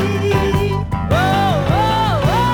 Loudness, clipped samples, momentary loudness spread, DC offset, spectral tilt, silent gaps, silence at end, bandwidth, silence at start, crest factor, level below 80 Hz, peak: -16 LUFS; under 0.1%; 3 LU; under 0.1%; -6.5 dB/octave; none; 0 s; 19.5 kHz; 0 s; 14 dB; -30 dBFS; -2 dBFS